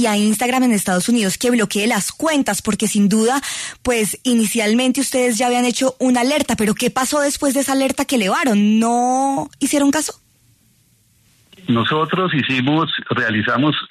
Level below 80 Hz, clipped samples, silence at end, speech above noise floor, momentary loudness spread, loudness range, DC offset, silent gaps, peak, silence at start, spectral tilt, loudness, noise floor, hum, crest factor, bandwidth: -52 dBFS; under 0.1%; 0.05 s; 40 dB; 4 LU; 4 LU; under 0.1%; none; -4 dBFS; 0 s; -4 dB/octave; -17 LUFS; -57 dBFS; none; 12 dB; 13.5 kHz